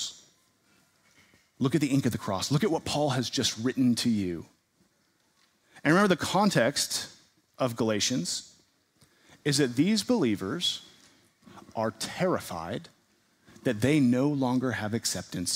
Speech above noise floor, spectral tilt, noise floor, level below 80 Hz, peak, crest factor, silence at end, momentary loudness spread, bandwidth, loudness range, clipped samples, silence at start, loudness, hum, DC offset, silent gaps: 43 dB; -4.5 dB/octave; -70 dBFS; -64 dBFS; -8 dBFS; 20 dB; 0 s; 10 LU; 16 kHz; 3 LU; under 0.1%; 0 s; -28 LUFS; none; under 0.1%; none